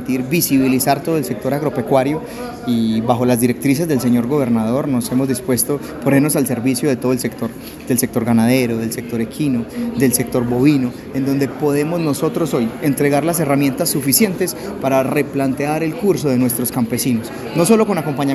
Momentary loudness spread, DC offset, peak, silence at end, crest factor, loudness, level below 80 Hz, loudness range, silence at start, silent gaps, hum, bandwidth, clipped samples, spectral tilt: 7 LU; under 0.1%; 0 dBFS; 0 s; 16 dB; -17 LUFS; -48 dBFS; 1 LU; 0 s; none; none; 14.5 kHz; under 0.1%; -5.5 dB/octave